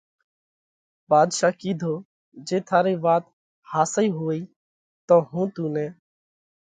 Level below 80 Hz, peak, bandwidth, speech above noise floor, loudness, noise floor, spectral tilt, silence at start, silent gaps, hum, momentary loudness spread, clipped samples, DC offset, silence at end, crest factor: -72 dBFS; -4 dBFS; 9.6 kHz; over 68 dB; -23 LUFS; under -90 dBFS; -5.5 dB/octave; 1.1 s; 2.05-2.32 s, 3.33-3.62 s, 4.56-5.08 s; none; 11 LU; under 0.1%; under 0.1%; 0.75 s; 20 dB